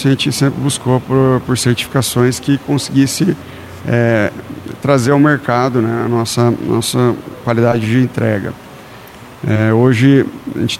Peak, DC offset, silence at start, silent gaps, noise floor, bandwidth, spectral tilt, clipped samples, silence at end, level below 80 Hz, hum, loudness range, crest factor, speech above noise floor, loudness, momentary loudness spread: 0 dBFS; under 0.1%; 0 s; none; -35 dBFS; 15.5 kHz; -5.5 dB/octave; under 0.1%; 0 s; -46 dBFS; none; 2 LU; 14 dB; 21 dB; -14 LUFS; 13 LU